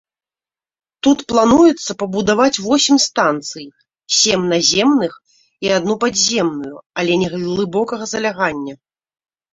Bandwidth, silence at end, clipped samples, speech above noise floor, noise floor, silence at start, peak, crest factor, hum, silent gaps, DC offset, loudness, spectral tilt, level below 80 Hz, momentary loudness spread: 8 kHz; 0.8 s; under 0.1%; over 74 dB; under -90 dBFS; 1.05 s; -2 dBFS; 16 dB; none; 6.86-6.90 s; under 0.1%; -15 LUFS; -3 dB/octave; -52 dBFS; 12 LU